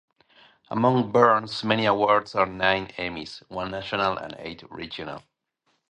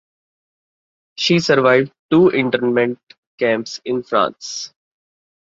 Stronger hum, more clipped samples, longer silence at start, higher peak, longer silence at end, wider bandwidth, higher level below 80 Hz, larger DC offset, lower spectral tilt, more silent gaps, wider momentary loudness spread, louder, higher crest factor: neither; neither; second, 0.7 s vs 1.2 s; about the same, -2 dBFS vs -2 dBFS; second, 0.7 s vs 0.9 s; first, 9.8 kHz vs 7.8 kHz; about the same, -58 dBFS vs -60 dBFS; neither; about the same, -6 dB/octave vs -5 dB/octave; second, none vs 1.99-2.09 s, 3.03-3.07 s, 3.18-3.38 s; first, 17 LU vs 14 LU; second, -24 LUFS vs -17 LUFS; first, 24 dB vs 18 dB